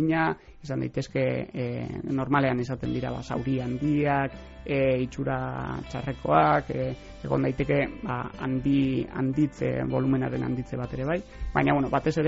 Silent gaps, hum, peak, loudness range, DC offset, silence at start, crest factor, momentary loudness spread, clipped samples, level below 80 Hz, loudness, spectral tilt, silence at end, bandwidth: none; none; -8 dBFS; 2 LU; under 0.1%; 0 s; 18 dB; 9 LU; under 0.1%; -46 dBFS; -27 LUFS; -6.5 dB/octave; 0 s; 7.6 kHz